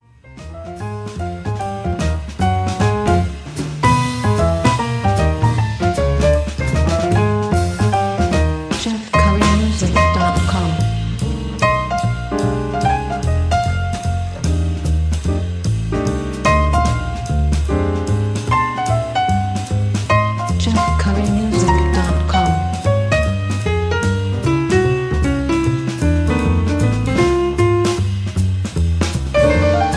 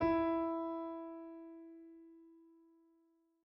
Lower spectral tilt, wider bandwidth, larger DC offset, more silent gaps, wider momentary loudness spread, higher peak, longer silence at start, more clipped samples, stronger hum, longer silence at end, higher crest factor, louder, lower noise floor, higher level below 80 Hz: second, -6.5 dB/octave vs -9 dB/octave; first, 11 kHz vs 5.6 kHz; neither; neither; second, 6 LU vs 25 LU; first, 0 dBFS vs -24 dBFS; first, 0.3 s vs 0 s; neither; neither; second, 0 s vs 1.05 s; about the same, 16 dB vs 18 dB; first, -17 LUFS vs -39 LUFS; second, -36 dBFS vs -75 dBFS; first, -24 dBFS vs -66 dBFS